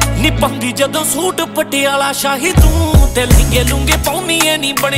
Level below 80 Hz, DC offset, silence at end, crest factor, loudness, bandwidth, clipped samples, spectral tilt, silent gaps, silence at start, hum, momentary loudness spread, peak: -16 dBFS; under 0.1%; 0 s; 12 dB; -13 LUFS; 16.5 kHz; under 0.1%; -4 dB/octave; none; 0 s; none; 5 LU; 0 dBFS